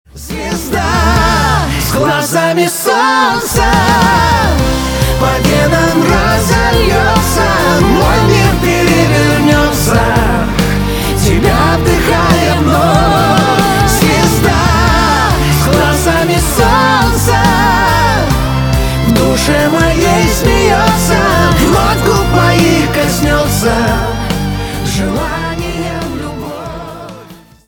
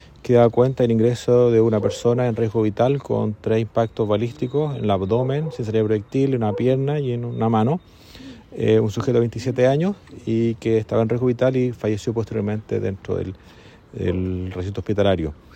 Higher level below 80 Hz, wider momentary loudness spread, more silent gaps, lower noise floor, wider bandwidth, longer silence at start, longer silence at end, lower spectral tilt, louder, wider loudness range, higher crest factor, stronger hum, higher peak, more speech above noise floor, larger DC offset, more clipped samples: first, -20 dBFS vs -50 dBFS; about the same, 7 LU vs 9 LU; neither; second, -35 dBFS vs -41 dBFS; first, over 20 kHz vs 9 kHz; about the same, 0.15 s vs 0.25 s; first, 0.35 s vs 0.2 s; second, -5 dB/octave vs -8 dB/octave; first, -10 LUFS vs -21 LUFS; second, 2 LU vs 5 LU; second, 10 dB vs 18 dB; neither; about the same, 0 dBFS vs -2 dBFS; about the same, 23 dB vs 21 dB; neither; neither